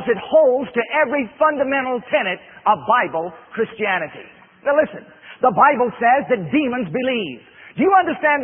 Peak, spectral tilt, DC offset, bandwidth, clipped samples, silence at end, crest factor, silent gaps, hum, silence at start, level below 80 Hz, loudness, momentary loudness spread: -2 dBFS; -10 dB/octave; under 0.1%; 3.6 kHz; under 0.1%; 0 s; 18 dB; none; none; 0 s; -60 dBFS; -18 LUFS; 11 LU